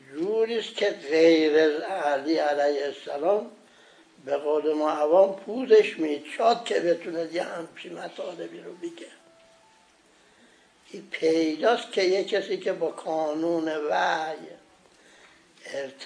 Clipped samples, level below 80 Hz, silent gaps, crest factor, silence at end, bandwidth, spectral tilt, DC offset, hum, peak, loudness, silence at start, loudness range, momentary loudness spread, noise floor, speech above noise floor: under 0.1%; -82 dBFS; none; 20 dB; 0 s; 10.5 kHz; -4 dB/octave; under 0.1%; none; -8 dBFS; -25 LUFS; 0.1 s; 12 LU; 19 LU; -59 dBFS; 34 dB